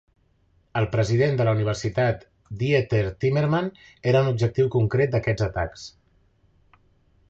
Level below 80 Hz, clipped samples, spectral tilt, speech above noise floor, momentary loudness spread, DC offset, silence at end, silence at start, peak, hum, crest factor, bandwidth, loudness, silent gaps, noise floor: -46 dBFS; under 0.1%; -7 dB/octave; 41 dB; 11 LU; under 0.1%; 1.4 s; 0.75 s; -6 dBFS; none; 18 dB; 7.8 kHz; -23 LUFS; none; -63 dBFS